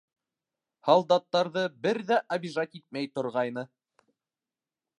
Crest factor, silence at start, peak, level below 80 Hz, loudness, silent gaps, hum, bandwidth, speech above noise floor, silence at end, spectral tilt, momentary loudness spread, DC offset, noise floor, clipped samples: 22 dB; 0.85 s; -6 dBFS; -80 dBFS; -28 LUFS; none; none; 10.5 kHz; over 63 dB; 1.3 s; -5.5 dB/octave; 12 LU; under 0.1%; under -90 dBFS; under 0.1%